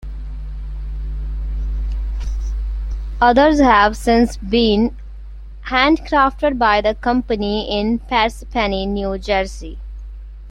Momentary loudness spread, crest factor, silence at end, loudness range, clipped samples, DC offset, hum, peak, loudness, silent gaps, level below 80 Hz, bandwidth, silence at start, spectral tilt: 21 LU; 18 dB; 0 s; 5 LU; under 0.1%; under 0.1%; none; 0 dBFS; -17 LUFS; none; -26 dBFS; 12 kHz; 0 s; -5.5 dB/octave